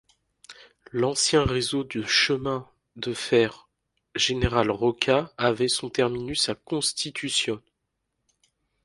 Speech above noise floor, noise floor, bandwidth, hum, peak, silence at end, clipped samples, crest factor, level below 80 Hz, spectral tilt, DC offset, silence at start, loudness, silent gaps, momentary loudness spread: 55 dB; -79 dBFS; 11.5 kHz; none; -2 dBFS; 1.25 s; under 0.1%; 24 dB; -46 dBFS; -3.5 dB/octave; under 0.1%; 0.5 s; -24 LUFS; none; 10 LU